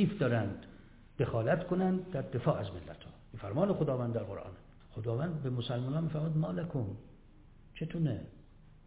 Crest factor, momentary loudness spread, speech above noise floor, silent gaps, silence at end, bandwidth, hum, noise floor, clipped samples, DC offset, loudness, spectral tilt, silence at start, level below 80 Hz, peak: 20 dB; 19 LU; 23 dB; none; 0.15 s; 4 kHz; none; -57 dBFS; under 0.1%; under 0.1%; -35 LUFS; -7.5 dB/octave; 0 s; -58 dBFS; -16 dBFS